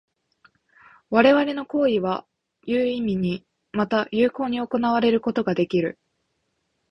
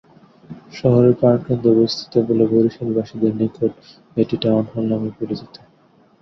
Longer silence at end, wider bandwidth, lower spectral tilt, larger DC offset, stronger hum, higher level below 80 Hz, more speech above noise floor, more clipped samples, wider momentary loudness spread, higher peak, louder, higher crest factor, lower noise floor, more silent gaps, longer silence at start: first, 1 s vs 0.75 s; about the same, 6.2 kHz vs 6.4 kHz; about the same, -7.5 dB/octave vs -8.5 dB/octave; neither; neither; second, -60 dBFS vs -54 dBFS; first, 52 dB vs 36 dB; neither; about the same, 10 LU vs 11 LU; about the same, -2 dBFS vs -2 dBFS; second, -22 LUFS vs -18 LUFS; first, 22 dB vs 16 dB; first, -74 dBFS vs -54 dBFS; neither; first, 1.1 s vs 0.5 s